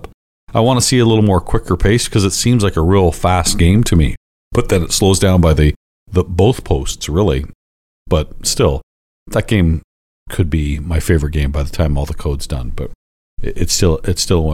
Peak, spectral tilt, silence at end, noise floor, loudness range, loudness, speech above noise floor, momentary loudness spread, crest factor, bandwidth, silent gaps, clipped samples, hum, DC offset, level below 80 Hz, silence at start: -2 dBFS; -5.5 dB/octave; 0 s; under -90 dBFS; 6 LU; -15 LUFS; over 77 dB; 11 LU; 12 dB; 16 kHz; 0.14-0.47 s, 4.17-4.51 s, 5.76-6.06 s, 7.55-8.06 s, 8.83-9.26 s, 9.84-10.26 s, 12.95-13.37 s; under 0.1%; none; under 0.1%; -22 dBFS; 0 s